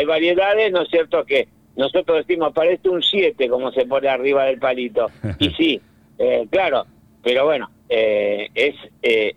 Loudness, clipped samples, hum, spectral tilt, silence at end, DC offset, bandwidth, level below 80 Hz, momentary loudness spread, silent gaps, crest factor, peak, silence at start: -19 LUFS; under 0.1%; none; -6 dB/octave; 0.05 s; under 0.1%; 9.4 kHz; -52 dBFS; 6 LU; none; 12 dB; -6 dBFS; 0 s